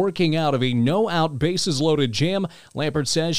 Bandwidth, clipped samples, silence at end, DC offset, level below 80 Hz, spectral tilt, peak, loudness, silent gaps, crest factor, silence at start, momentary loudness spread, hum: 15.5 kHz; under 0.1%; 0 s; 1%; -52 dBFS; -5 dB/octave; -8 dBFS; -22 LUFS; none; 14 dB; 0 s; 5 LU; none